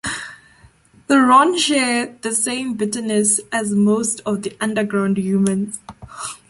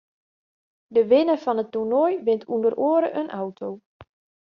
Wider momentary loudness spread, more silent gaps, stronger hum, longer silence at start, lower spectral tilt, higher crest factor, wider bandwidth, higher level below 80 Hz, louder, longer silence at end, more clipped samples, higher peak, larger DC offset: first, 16 LU vs 13 LU; second, none vs 3.86-4.00 s; neither; second, 0.05 s vs 0.9 s; second, -3.5 dB/octave vs -5 dB/octave; about the same, 18 dB vs 16 dB; first, 11.5 kHz vs 6 kHz; first, -56 dBFS vs -70 dBFS; first, -18 LUFS vs -22 LUFS; second, 0.15 s vs 0.4 s; neither; first, -2 dBFS vs -6 dBFS; neither